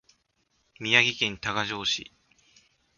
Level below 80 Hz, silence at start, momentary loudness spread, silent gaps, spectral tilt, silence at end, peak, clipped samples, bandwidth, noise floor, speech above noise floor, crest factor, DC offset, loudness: -62 dBFS; 0.8 s; 10 LU; none; -2 dB/octave; 0.95 s; -4 dBFS; under 0.1%; 7.4 kHz; -72 dBFS; 45 dB; 26 dB; under 0.1%; -25 LUFS